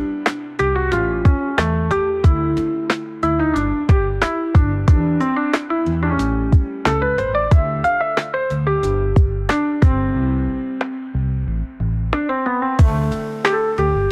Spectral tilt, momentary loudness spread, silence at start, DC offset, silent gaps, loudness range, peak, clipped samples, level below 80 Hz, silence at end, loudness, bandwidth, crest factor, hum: -8 dB/octave; 6 LU; 0 s; 0.1%; none; 3 LU; -2 dBFS; under 0.1%; -24 dBFS; 0 s; -19 LUFS; 10 kHz; 14 dB; none